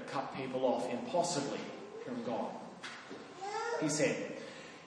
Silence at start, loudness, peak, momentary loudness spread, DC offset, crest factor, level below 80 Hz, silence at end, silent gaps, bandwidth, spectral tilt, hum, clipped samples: 0 s; -37 LUFS; -20 dBFS; 13 LU; under 0.1%; 18 dB; -80 dBFS; 0 s; none; 10.5 kHz; -4 dB/octave; none; under 0.1%